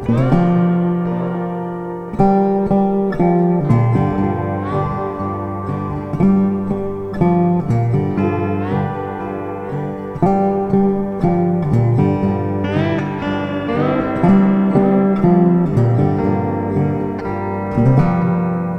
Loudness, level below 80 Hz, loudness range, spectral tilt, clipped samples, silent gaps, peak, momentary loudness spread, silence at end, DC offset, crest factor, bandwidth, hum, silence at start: -17 LUFS; -38 dBFS; 4 LU; -10 dB/octave; under 0.1%; none; 0 dBFS; 9 LU; 0 s; under 0.1%; 16 dB; 5.6 kHz; none; 0 s